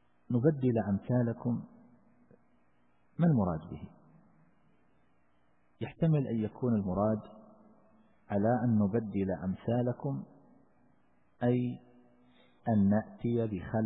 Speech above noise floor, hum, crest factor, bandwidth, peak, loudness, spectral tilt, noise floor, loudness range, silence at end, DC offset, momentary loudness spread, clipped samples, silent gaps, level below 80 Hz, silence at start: 42 dB; none; 18 dB; 3.9 kHz; -14 dBFS; -32 LUFS; -12.5 dB/octave; -72 dBFS; 4 LU; 0 s; under 0.1%; 16 LU; under 0.1%; none; -62 dBFS; 0.3 s